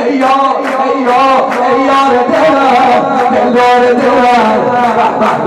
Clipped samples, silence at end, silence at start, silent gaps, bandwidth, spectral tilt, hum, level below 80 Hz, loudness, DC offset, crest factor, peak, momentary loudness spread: under 0.1%; 0 s; 0 s; none; 13 kHz; -5 dB/octave; none; -48 dBFS; -9 LUFS; under 0.1%; 6 dB; -2 dBFS; 3 LU